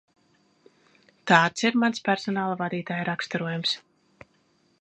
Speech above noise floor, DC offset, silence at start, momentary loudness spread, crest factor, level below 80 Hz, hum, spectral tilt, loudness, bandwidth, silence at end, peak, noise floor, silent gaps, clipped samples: 41 dB; under 0.1%; 1.25 s; 9 LU; 26 dB; -72 dBFS; none; -4.5 dB/octave; -25 LUFS; 8.8 kHz; 1 s; -2 dBFS; -66 dBFS; none; under 0.1%